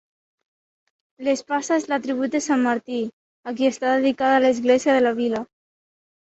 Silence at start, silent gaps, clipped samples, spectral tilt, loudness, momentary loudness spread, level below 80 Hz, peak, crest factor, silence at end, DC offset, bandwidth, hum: 1.2 s; 3.13-3.43 s; under 0.1%; -3.5 dB/octave; -21 LUFS; 11 LU; -68 dBFS; -6 dBFS; 16 dB; 0.75 s; under 0.1%; 8.2 kHz; none